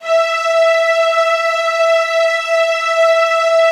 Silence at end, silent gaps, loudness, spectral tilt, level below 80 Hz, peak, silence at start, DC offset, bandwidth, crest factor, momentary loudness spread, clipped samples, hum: 0 s; none; -13 LUFS; 3 dB/octave; -68 dBFS; -2 dBFS; 0 s; under 0.1%; 13 kHz; 10 dB; 3 LU; under 0.1%; none